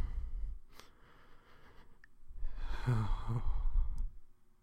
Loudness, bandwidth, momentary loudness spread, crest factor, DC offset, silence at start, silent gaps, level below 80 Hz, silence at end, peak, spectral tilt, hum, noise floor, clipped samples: -41 LUFS; 5.8 kHz; 23 LU; 14 dB; under 0.1%; 0 s; none; -38 dBFS; 0.3 s; -22 dBFS; -7.5 dB/octave; none; -58 dBFS; under 0.1%